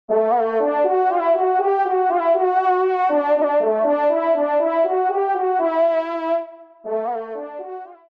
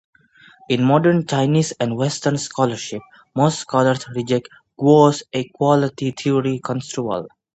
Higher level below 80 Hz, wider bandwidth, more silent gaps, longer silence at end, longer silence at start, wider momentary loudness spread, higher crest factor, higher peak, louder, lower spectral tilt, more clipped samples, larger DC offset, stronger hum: second, -78 dBFS vs -60 dBFS; second, 5.2 kHz vs 8.8 kHz; neither; about the same, 0.25 s vs 0.25 s; second, 0.1 s vs 0.7 s; about the same, 11 LU vs 10 LU; second, 10 dB vs 18 dB; second, -8 dBFS vs 0 dBFS; about the same, -19 LUFS vs -19 LUFS; about the same, -7 dB/octave vs -6 dB/octave; neither; neither; neither